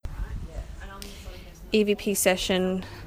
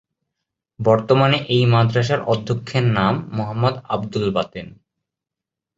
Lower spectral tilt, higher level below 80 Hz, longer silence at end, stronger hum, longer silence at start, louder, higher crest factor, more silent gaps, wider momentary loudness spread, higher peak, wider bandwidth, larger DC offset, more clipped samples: second, -4 dB/octave vs -7 dB/octave; first, -40 dBFS vs -50 dBFS; second, 0 s vs 1.1 s; neither; second, 0.05 s vs 0.8 s; second, -25 LUFS vs -19 LUFS; about the same, 20 dB vs 18 dB; neither; first, 19 LU vs 9 LU; second, -8 dBFS vs -2 dBFS; first, 16 kHz vs 7.8 kHz; neither; neither